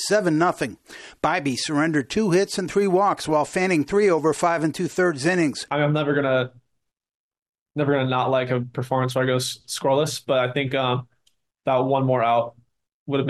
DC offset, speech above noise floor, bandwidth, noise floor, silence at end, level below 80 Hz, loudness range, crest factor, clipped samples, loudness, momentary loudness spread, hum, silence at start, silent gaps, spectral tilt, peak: under 0.1%; 56 dB; 13 kHz; -77 dBFS; 0 s; -60 dBFS; 3 LU; 14 dB; under 0.1%; -22 LUFS; 7 LU; none; 0 s; 7.15-7.31 s, 7.42-7.53 s, 7.61-7.66 s, 12.93-13.06 s; -5.5 dB/octave; -8 dBFS